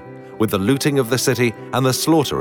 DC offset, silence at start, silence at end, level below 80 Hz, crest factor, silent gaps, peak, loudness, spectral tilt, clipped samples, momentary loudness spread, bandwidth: under 0.1%; 0 s; 0 s; -54 dBFS; 12 dB; none; -6 dBFS; -18 LUFS; -5 dB/octave; under 0.1%; 5 LU; 20 kHz